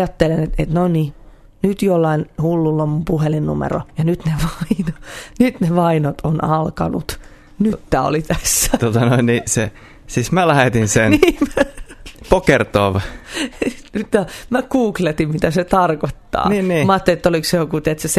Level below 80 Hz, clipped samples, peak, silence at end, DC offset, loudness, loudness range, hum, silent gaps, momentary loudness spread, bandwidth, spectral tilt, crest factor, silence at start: -34 dBFS; under 0.1%; 0 dBFS; 0 s; under 0.1%; -17 LUFS; 3 LU; none; none; 9 LU; 14 kHz; -5.5 dB/octave; 16 dB; 0 s